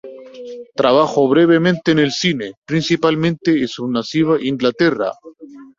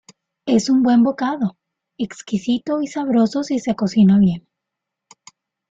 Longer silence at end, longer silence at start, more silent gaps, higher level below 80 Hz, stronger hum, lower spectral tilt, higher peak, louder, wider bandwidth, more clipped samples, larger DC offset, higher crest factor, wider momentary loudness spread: second, 0.15 s vs 1.3 s; second, 0.05 s vs 0.45 s; first, 2.58-2.62 s vs none; about the same, -56 dBFS vs -58 dBFS; neither; about the same, -6 dB/octave vs -6.5 dB/octave; about the same, -2 dBFS vs -4 dBFS; about the same, -16 LUFS vs -18 LUFS; about the same, 7.6 kHz vs 7.8 kHz; neither; neither; about the same, 16 dB vs 14 dB; about the same, 15 LU vs 14 LU